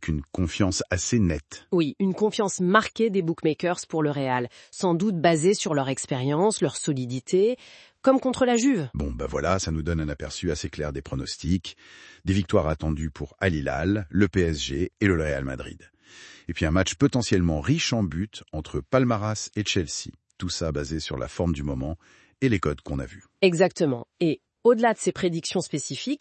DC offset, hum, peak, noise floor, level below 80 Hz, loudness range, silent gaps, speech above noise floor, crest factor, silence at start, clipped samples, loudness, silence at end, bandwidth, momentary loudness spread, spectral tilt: under 0.1%; none; -4 dBFS; -49 dBFS; -44 dBFS; 4 LU; none; 24 dB; 20 dB; 0 s; under 0.1%; -25 LUFS; 0.05 s; 8.8 kHz; 11 LU; -5 dB/octave